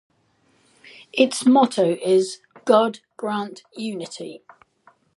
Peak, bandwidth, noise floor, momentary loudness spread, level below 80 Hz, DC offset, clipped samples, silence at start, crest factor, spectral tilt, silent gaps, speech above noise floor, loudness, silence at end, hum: -2 dBFS; 11.5 kHz; -63 dBFS; 17 LU; -76 dBFS; under 0.1%; under 0.1%; 1.15 s; 20 dB; -4.5 dB/octave; none; 43 dB; -21 LUFS; 0.8 s; none